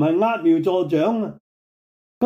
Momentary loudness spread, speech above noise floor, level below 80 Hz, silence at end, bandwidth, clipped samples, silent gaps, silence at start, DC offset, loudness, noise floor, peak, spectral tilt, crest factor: 7 LU; over 71 dB; -68 dBFS; 0 s; 6.8 kHz; under 0.1%; 1.40-2.21 s; 0 s; under 0.1%; -20 LUFS; under -90 dBFS; -6 dBFS; -8.5 dB/octave; 14 dB